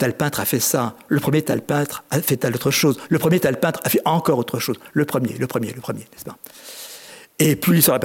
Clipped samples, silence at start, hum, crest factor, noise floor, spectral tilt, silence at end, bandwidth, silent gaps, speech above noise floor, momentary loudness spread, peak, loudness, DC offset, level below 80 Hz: under 0.1%; 0 s; none; 20 dB; -41 dBFS; -5 dB/octave; 0 s; 17 kHz; none; 21 dB; 18 LU; 0 dBFS; -20 LUFS; under 0.1%; -58 dBFS